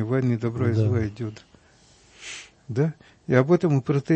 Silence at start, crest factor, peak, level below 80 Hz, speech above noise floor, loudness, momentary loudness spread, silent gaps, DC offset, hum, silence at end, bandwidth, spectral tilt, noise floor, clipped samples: 0 s; 22 dB; -2 dBFS; -54 dBFS; 33 dB; -24 LUFS; 18 LU; none; under 0.1%; none; 0 s; 8.6 kHz; -8 dB/octave; -56 dBFS; under 0.1%